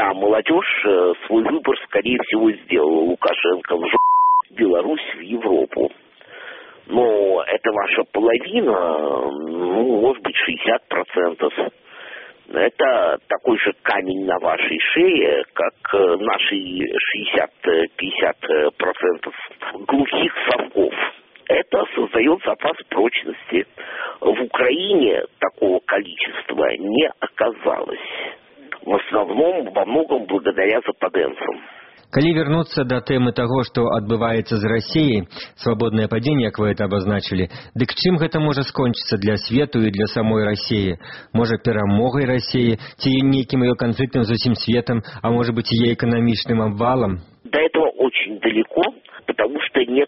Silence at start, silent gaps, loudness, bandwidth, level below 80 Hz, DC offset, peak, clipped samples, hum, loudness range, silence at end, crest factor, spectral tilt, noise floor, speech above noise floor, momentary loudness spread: 0 s; none; -19 LUFS; 6 kHz; -52 dBFS; under 0.1%; -2 dBFS; under 0.1%; none; 3 LU; 0 s; 16 dB; -4 dB/octave; -39 dBFS; 20 dB; 7 LU